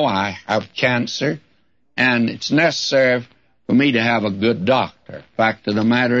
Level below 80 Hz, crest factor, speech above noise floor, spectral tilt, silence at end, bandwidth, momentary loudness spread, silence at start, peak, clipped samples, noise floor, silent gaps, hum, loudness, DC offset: -60 dBFS; 14 dB; 40 dB; -5 dB/octave; 0 s; 7.6 kHz; 10 LU; 0 s; -4 dBFS; under 0.1%; -58 dBFS; none; none; -18 LUFS; under 0.1%